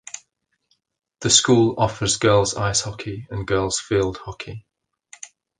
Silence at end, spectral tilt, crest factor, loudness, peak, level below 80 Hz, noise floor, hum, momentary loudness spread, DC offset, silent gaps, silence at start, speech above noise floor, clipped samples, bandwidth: 0.35 s; -3.5 dB/octave; 22 dB; -19 LUFS; -2 dBFS; -46 dBFS; -70 dBFS; none; 22 LU; under 0.1%; none; 0.15 s; 50 dB; under 0.1%; 10 kHz